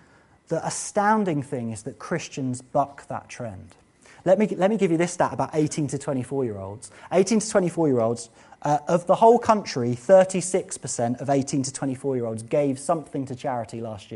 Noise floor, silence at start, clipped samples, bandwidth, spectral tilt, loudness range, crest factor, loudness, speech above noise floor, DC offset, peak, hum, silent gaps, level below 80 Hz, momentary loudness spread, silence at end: -56 dBFS; 0.5 s; under 0.1%; 11.5 kHz; -5.5 dB/octave; 6 LU; 20 dB; -24 LUFS; 32 dB; under 0.1%; -4 dBFS; none; none; -62 dBFS; 15 LU; 0 s